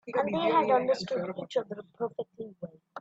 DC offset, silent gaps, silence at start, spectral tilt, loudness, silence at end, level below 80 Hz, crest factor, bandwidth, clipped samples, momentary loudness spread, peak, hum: under 0.1%; none; 0.05 s; -6 dB/octave; -29 LUFS; 0 s; -74 dBFS; 18 dB; 8 kHz; under 0.1%; 17 LU; -12 dBFS; none